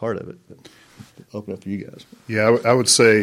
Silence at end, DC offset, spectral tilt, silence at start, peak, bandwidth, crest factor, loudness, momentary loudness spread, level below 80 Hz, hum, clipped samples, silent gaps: 0 s; under 0.1%; -3.5 dB/octave; 0 s; 0 dBFS; 16 kHz; 20 dB; -18 LUFS; 22 LU; -62 dBFS; none; under 0.1%; none